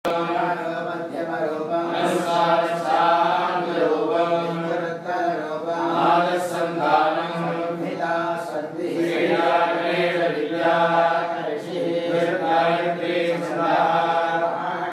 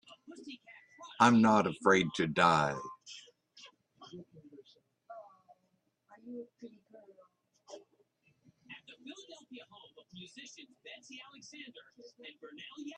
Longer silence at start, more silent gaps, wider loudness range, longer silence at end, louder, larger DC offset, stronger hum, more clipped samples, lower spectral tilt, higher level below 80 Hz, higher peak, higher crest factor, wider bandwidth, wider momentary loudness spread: second, 0.05 s vs 0.3 s; neither; second, 2 LU vs 25 LU; about the same, 0 s vs 0.05 s; first, -22 LUFS vs -28 LUFS; neither; neither; neither; about the same, -5.5 dB/octave vs -5 dB/octave; about the same, -76 dBFS vs -74 dBFS; first, -6 dBFS vs -10 dBFS; second, 16 dB vs 26 dB; first, 14.5 kHz vs 10.5 kHz; second, 8 LU vs 27 LU